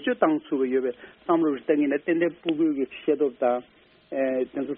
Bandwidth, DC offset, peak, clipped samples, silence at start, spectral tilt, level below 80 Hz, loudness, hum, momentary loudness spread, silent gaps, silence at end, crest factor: 3.8 kHz; under 0.1%; -6 dBFS; under 0.1%; 0 s; -4.5 dB/octave; -68 dBFS; -25 LUFS; none; 5 LU; none; 0 s; 20 dB